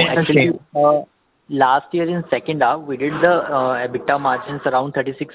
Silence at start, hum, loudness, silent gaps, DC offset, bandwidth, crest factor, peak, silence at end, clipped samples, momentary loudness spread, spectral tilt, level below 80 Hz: 0 s; none; -18 LUFS; none; under 0.1%; 4 kHz; 16 dB; -2 dBFS; 0.1 s; under 0.1%; 6 LU; -9.5 dB/octave; -58 dBFS